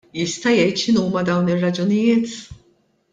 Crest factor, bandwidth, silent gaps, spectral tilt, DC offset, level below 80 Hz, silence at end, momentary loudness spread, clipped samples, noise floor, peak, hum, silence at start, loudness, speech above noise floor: 14 dB; 9.2 kHz; none; -5.5 dB/octave; under 0.1%; -56 dBFS; 0.6 s; 7 LU; under 0.1%; -60 dBFS; -6 dBFS; none; 0.15 s; -19 LUFS; 42 dB